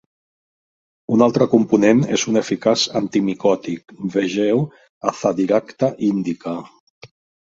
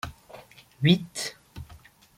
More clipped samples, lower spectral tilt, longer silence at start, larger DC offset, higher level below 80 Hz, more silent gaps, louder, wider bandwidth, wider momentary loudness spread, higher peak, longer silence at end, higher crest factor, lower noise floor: neither; about the same, -5.5 dB/octave vs -5 dB/octave; first, 1.1 s vs 0.05 s; neither; about the same, -60 dBFS vs -56 dBFS; first, 4.89-5.01 s, 6.80-7.01 s vs none; first, -19 LUFS vs -26 LUFS; second, 7.8 kHz vs 16 kHz; second, 13 LU vs 25 LU; first, 0 dBFS vs -8 dBFS; about the same, 0.5 s vs 0.45 s; about the same, 18 dB vs 22 dB; first, under -90 dBFS vs -52 dBFS